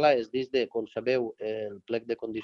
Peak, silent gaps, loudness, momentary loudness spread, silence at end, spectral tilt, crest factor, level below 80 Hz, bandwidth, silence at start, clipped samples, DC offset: -10 dBFS; none; -30 LUFS; 6 LU; 0 s; -6 dB/octave; 18 dB; -70 dBFS; 7 kHz; 0 s; under 0.1%; under 0.1%